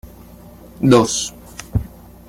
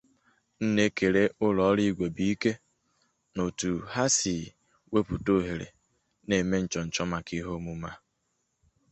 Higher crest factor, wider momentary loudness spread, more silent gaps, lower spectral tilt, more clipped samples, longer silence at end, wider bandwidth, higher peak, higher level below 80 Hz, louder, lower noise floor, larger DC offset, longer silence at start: about the same, 18 dB vs 20 dB; first, 20 LU vs 14 LU; neither; about the same, -5 dB/octave vs -4.5 dB/octave; neither; second, 0.4 s vs 0.95 s; first, 16 kHz vs 8.4 kHz; first, -2 dBFS vs -10 dBFS; first, -38 dBFS vs -52 dBFS; first, -18 LUFS vs -28 LUFS; second, -41 dBFS vs -77 dBFS; neither; second, 0.05 s vs 0.6 s